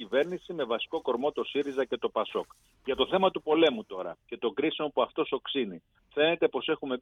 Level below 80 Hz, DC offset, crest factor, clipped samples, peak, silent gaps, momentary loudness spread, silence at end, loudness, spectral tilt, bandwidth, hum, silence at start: -66 dBFS; under 0.1%; 18 dB; under 0.1%; -10 dBFS; none; 12 LU; 0 s; -30 LUFS; -6 dB/octave; 7.2 kHz; none; 0 s